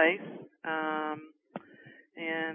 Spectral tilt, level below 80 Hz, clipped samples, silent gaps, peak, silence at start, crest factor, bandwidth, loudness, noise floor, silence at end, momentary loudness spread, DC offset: 1 dB/octave; under -90 dBFS; under 0.1%; none; -12 dBFS; 0 s; 22 dB; 3.6 kHz; -34 LUFS; -56 dBFS; 0 s; 19 LU; under 0.1%